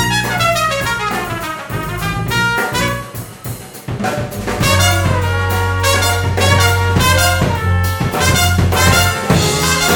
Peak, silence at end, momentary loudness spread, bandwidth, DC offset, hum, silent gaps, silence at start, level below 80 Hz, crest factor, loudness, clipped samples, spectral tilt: 0 dBFS; 0 s; 11 LU; 18 kHz; under 0.1%; none; none; 0 s; -30 dBFS; 14 dB; -14 LUFS; under 0.1%; -4 dB/octave